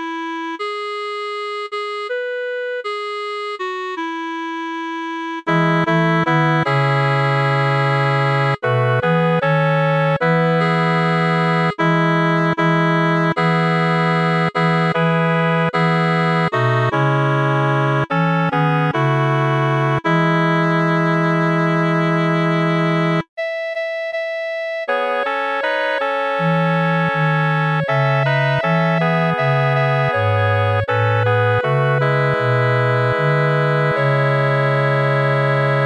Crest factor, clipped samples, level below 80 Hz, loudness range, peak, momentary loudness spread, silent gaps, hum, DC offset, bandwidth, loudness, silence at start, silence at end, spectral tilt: 12 dB; under 0.1%; -58 dBFS; 4 LU; -4 dBFS; 8 LU; 23.29-23.37 s; none; 0.1%; 11 kHz; -17 LUFS; 0 s; 0 s; -7.5 dB/octave